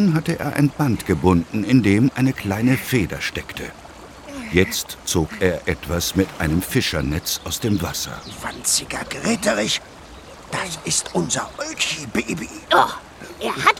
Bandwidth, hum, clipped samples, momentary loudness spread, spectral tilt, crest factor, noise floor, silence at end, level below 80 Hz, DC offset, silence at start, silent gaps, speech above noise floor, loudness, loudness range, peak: 18.5 kHz; none; under 0.1%; 14 LU; -4.5 dB/octave; 20 dB; -40 dBFS; 0 s; -40 dBFS; under 0.1%; 0 s; none; 20 dB; -21 LUFS; 4 LU; 0 dBFS